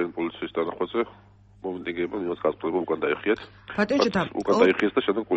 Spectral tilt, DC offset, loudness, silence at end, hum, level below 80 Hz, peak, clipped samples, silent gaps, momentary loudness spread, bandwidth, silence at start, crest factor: -6 dB/octave; under 0.1%; -26 LUFS; 0 s; none; -58 dBFS; -8 dBFS; under 0.1%; none; 11 LU; 8.4 kHz; 0 s; 18 dB